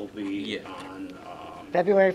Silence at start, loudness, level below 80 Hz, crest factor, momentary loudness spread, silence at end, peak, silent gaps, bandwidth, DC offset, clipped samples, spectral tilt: 0 s; -28 LUFS; -64 dBFS; 18 dB; 18 LU; 0 s; -10 dBFS; none; 11 kHz; under 0.1%; under 0.1%; -6.5 dB/octave